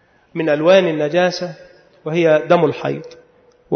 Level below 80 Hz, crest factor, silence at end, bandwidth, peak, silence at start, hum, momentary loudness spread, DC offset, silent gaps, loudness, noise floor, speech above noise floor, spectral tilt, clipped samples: -64 dBFS; 16 dB; 0 s; 6.6 kHz; -2 dBFS; 0.35 s; none; 17 LU; under 0.1%; none; -16 LUFS; -52 dBFS; 36 dB; -6 dB/octave; under 0.1%